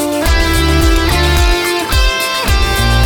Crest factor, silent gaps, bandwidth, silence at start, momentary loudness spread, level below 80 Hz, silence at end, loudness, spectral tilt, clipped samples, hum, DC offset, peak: 10 dB; none; 19.5 kHz; 0 s; 2 LU; -14 dBFS; 0 s; -12 LUFS; -4 dB/octave; under 0.1%; none; under 0.1%; 0 dBFS